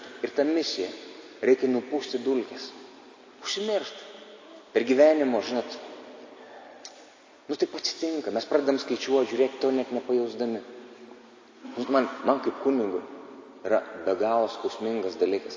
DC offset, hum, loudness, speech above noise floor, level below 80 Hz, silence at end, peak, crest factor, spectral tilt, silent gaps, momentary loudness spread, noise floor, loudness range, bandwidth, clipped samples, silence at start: under 0.1%; none; -27 LUFS; 26 dB; -78 dBFS; 0 s; -8 dBFS; 20 dB; -4 dB/octave; none; 21 LU; -52 dBFS; 4 LU; 7.6 kHz; under 0.1%; 0 s